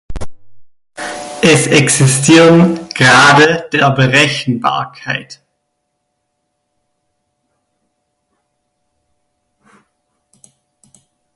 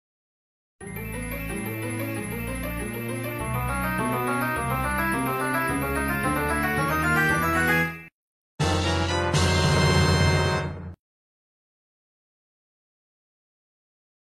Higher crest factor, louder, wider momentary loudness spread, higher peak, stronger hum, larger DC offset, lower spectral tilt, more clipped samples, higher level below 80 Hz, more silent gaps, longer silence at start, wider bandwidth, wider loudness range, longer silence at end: about the same, 14 dB vs 18 dB; first, -10 LUFS vs -25 LUFS; first, 18 LU vs 11 LU; first, 0 dBFS vs -8 dBFS; neither; neither; about the same, -4 dB/octave vs -5 dB/octave; neither; about the same, -42 dBFS vs -40 dBFS; second, none vs 8.12-8.58 s; second, 0.1 s vs 0.8 s; second, 11.5 kHz vs 15 kHz; first, 16 LU vs 8 LU; first, 6 s vs 3.25 s